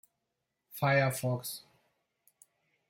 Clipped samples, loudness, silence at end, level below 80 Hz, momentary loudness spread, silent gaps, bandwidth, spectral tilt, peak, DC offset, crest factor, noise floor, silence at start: under 0.1%; -31 LUFS; 1.3 s; -74 dBFS; 18 LU; none; 16.5 kHz; -5 dB/octave; -16 dBFS; under 0.1%; 20 dB; -85 dBFS; 0.7 s